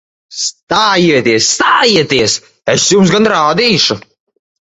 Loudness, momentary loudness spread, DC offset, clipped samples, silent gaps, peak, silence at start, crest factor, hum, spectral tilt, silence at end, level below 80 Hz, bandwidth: -10 LUFS; 10 LU; under 0.1%; under 0.1%; 0.63-0.67 s; 0 dBFS; 0.3 s; 12 dB; none; -3 dB/octave; 0.7 s; -48 dBFS; 8.4 kHz